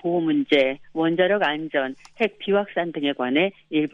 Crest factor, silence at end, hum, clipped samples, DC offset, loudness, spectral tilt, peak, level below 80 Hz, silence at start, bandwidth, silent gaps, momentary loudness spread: 18 dB; 0.05 s; none; under 0.1%; under 0.1%; -23 LUFS; -7 dB/octave; -6 dBFS; -66 dBFS; 0.05 s; 7.6 kHz; none; 6 LU